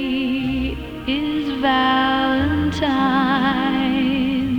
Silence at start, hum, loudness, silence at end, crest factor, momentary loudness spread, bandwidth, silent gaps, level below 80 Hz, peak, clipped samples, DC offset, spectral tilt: 0 s; none; -19 LUFS; 0 s; 16 dB; 6 LU; 8.2 kHz; none; -38 dBFS; -4 dBFS; under 0.1%; under 0.1%; -6 dB/octave